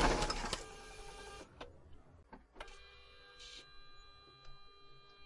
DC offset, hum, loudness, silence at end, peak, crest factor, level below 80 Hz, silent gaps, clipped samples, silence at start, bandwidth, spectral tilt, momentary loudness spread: under 0.1%; none; -44 LUFS; 0 s; -18 dBFS; 26 dB; -50 dBFS; none; under 0.1%; 0 s; 11.5 kHz; -3.5 dB/octave; 22 LU